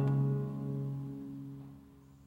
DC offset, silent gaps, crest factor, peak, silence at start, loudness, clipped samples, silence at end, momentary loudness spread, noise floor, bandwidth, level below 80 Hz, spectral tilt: under 0.1%; none; 14 dB; -22 dBFS; 0 s; -37 LUFS; under 0.1%; 0 s; 19 LU; -57 dBFS; 3.4 kHz; -64 dBFS; -10.5 dB/octave